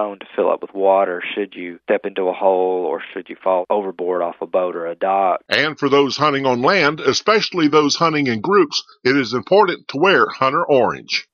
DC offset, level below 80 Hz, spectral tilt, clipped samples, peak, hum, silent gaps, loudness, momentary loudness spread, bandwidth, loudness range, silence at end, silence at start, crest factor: under 0.1%; -64 dBFS; -4.5 dB/octave; under 0.1%; 0 dBFS; none; none; -17 LUFS; 8 LU; 7.2 kHz; 4 LU; 0.1 s; 0 s; 18 dB